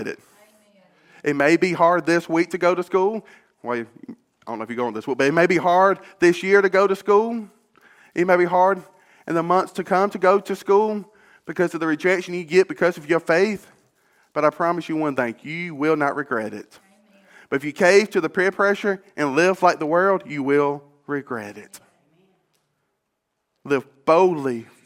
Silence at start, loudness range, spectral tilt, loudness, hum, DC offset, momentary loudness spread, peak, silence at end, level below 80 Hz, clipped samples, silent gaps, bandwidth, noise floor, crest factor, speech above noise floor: 0 s; 6 LU; -5.5 dB/octave; -20 LUFS; none; under 0.1%; 14 LU; -2 dBFS; 0.25 s; -70 dBFS; under 0.1%; none; 15 kHz; -76 dBFS; 20 dB; 56 dB